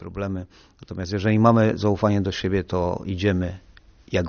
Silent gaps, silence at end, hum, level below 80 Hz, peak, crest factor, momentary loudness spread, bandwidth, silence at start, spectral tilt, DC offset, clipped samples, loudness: none; 0 s; none; -46 dBFS; -2 dBFS; 20 dB; 15 LU; 6.8 kHz; 0 s; -6.5 dB/octave; under 0.1%; under 0.1%; -22 LUFS